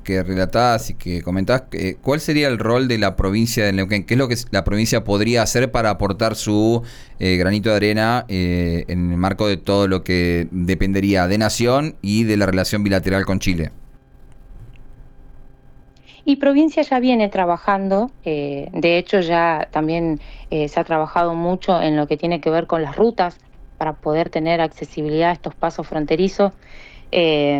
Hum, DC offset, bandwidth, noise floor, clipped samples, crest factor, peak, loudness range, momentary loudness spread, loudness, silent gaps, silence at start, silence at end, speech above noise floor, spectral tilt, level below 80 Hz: none; under 0.1%; over 20 kHz; -45 dBFS; under 0.1%; 12 dB; -6 dBFS; 3 LU; 7 LU; -19 LUFS; none; 0 s; 0 s; 27 dB; -5.5 dB/octave; -36 dBFS